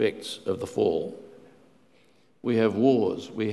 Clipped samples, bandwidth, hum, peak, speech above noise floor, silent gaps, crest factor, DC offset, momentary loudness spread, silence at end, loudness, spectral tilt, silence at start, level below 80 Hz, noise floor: under 0.1%; 12.5 kHz; none; -8 dBFS; 37 dB; none; 18 dB; under 0.1%; 13 LU; 0 s; -26 LUFS; -6.5 dB/octave; 0 s; -62 dBFS; -62 dBFS